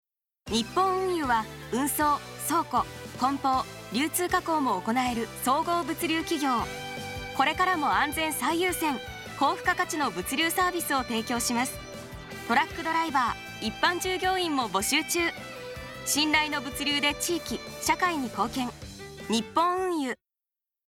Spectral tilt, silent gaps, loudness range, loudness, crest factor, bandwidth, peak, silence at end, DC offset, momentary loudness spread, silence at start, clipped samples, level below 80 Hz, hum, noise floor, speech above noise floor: -2.5 dB/octave; none; 2 LU; -27 LUFS; 18 dB; 19 kHz; -10 dBFS; 0.7 s; under 0.1%; 10 LU; 0.45 s; under 0.1%; -52 dBFS; none; under -90 dBFS; over 63 dB